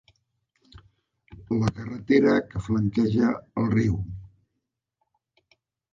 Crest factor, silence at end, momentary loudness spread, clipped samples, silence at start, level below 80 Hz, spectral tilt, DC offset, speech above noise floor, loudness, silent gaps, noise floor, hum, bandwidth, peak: 20 dB; 1.65 s; 12 LU; under 0.1%; 1.3 s; -48 dBFS; -8 dB/octave; under 0.1%; 58 dB; -24 LUFS; none; -81 dBFS; none; 7.6 kHz; -6 dBFS